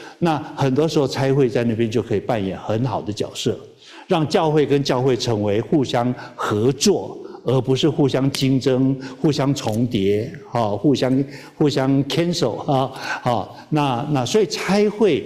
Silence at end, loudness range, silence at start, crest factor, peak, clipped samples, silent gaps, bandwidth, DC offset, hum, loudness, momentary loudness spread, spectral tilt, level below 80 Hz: 0 s; 2 LU; 0 s; 14 dB; -4 dBFS; under 0.1%; none; 15 kHz; under 0.1%; none; -20 LUFS; 6 LU; -6 dB/octave; -52 dBFS